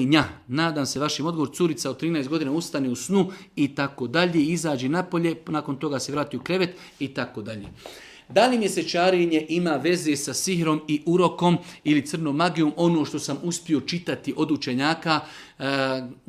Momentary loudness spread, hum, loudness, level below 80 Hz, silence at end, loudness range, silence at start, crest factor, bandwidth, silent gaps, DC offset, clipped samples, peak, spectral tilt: 8 LU; none; -24 LUFS; -60 dBFS; 0.15 s; 3 LU; 0 s; 20 dB; 15 kHz; none; under 0.1%; under 0.1%; -4 dBFS; -5 dB/octave